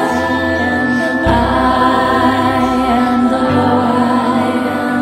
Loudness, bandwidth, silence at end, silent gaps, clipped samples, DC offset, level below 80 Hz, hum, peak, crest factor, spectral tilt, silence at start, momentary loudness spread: -13 LUFS; 13.5 kHz; 0 s; none; under 0.1%; under 0.1%; -32 dBFS; none; 0 dBFS; 12 dB; -6 dB/octave; 0 s; 3 LU